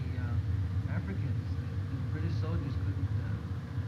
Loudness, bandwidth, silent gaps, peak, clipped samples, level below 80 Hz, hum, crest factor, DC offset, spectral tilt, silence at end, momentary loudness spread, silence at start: -34 LUFS; 6.8 kHz; none; -20 dBFS; under 0.1%; -44 dBFS; none; 12 dB; under 0.1%; -8.5 dB/octave; 0 s; 3 LU; 0 s